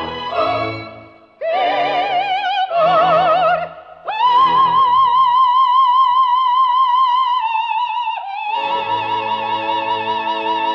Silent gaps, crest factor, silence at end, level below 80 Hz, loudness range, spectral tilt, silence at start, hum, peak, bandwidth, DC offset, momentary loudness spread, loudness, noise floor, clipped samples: none; 12 dB; 0 s; -56 dBFS; 5 LU; -5 dB/octave; 0 s; none; -4 dBFS; 6.2 kHz; under 0.1%; 10 LU; -15 LUFS; -40 dBFS; under 0.1%